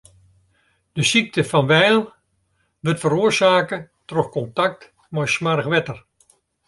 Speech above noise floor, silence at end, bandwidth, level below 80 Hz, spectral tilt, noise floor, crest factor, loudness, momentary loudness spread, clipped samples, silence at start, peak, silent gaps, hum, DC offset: 49 dB; 0.7 s; 11.5 kHz; -58 dBFS; -4.5 dB/octave; -67 dBFS; 20 dB; -19 LUFS; 15 LU; under 0.1%; 0.95 s; -2 dBFS; none; none; under 0.1%